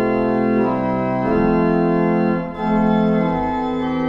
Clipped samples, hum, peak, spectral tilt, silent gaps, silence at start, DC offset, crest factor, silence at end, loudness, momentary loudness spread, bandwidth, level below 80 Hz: under 0.1%; none; -6 dBFS; -9.5 dB/octave; none; 0 s; under 0.1%; 12 dB; 0 s; -18 LUFS; 4 LU; 5.8 kHz; -38 dBFS